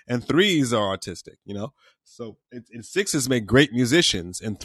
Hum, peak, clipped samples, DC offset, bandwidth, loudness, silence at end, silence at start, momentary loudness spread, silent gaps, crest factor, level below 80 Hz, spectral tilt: none; -4 dBFS; under 0.1%; under 0.1%; 13 kHz; -21 LUFS; 0 s; 0.1 s; 21 LU; none; 20 dB; -50 dBFS; -4 dB/octave